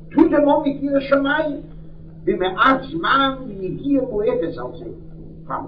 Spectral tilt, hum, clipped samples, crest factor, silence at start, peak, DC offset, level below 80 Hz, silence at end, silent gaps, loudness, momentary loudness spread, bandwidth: -8 dB/octave; none; under 0.1%; 20 dB; 0 s; 0 dBFS; under 0.1%; -42 dBFS; 0 s; none; -19 LUFS; 19 LU; 5.2 kHz